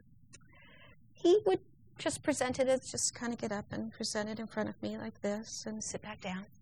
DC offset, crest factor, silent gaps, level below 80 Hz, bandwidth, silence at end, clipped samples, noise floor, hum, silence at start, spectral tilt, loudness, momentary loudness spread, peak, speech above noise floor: under 0.1%; 18 dB; none; -66 dBFS; 13 kHz; 0.15 s; under 0.1%; -60 dBFS; none; 0.3 s; -3.5 dB/octave; -35 LUFS; 12 LU; -18 dBFS; 26 dB